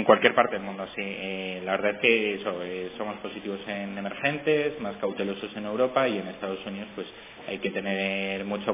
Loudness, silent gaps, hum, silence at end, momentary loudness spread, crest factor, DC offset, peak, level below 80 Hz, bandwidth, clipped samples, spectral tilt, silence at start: -28 LUFS; none; none; 0 s; 13 LU; 26 dB; under 0.1%; -2 dBFS; -64 dBFS; 3.8 kHz; under 0.1%; -8.5 dB/octave; 0 s